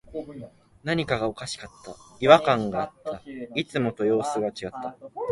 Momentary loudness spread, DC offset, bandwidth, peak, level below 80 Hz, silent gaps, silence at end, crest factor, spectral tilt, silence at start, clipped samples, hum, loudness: 20 LU; under 0.1%; 11.5 kHz; -2 dBFS; -56 dBFS; none; 0 s; 24 dB; -5.5 dB/octave; 0.05 s; under 0.1%; none; -25 LUFS